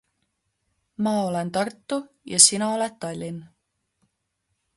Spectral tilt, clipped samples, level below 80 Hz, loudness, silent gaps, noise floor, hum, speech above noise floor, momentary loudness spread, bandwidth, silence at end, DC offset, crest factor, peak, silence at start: -2.5 dB/octave; under 0.1%; -68 dBFS; -21 LUFS; none; -76 dBFS; none; 53 dB; 18 LU; 12 kHz; 1.3 s; under 0.1%; 26 dB; 0 dBFS; 1 s